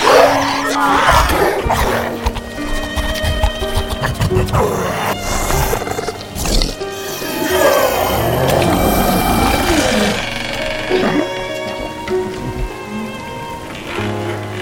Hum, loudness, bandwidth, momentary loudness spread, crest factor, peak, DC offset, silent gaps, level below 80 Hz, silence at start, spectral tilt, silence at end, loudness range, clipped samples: none; -16 LUFS; 17 kHz; 12 LU; 16 dB; 0 dBFS; under 0.1%; none; -26 dBFS; 0 s; -4.5 dB/octave; 0 s; 6 LU; under 0.1%